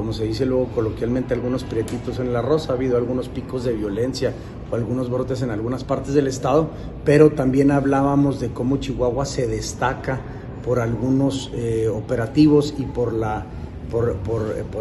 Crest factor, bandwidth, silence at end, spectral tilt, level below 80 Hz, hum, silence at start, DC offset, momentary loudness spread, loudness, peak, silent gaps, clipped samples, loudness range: 20 dB; 12 kHz; 0 s; -7 dB/octave; -38 dBFS; none; 0 s; under 0.1%; 10 LU; -21 LUFS; 0 dBFS; none; under 0.1%; 5 LU